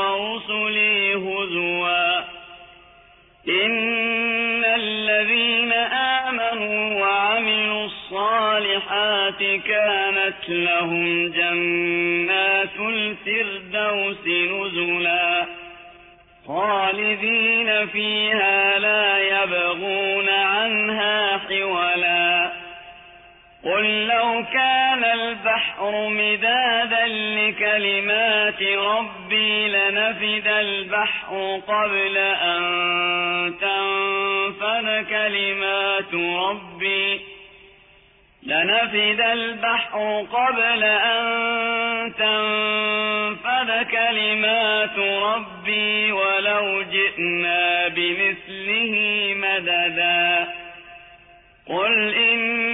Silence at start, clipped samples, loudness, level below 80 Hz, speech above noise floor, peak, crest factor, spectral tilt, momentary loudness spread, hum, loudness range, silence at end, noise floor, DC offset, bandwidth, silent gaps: 0 s; under 0.1%; -19 LUFS; -62 dBFS; 33 dB; -8 dBFS; 14 dB; -6 dB/octave; 6 LU; none; 3 LU; 0 s; -54 dBFS; under 0.1%; 4 kHz; none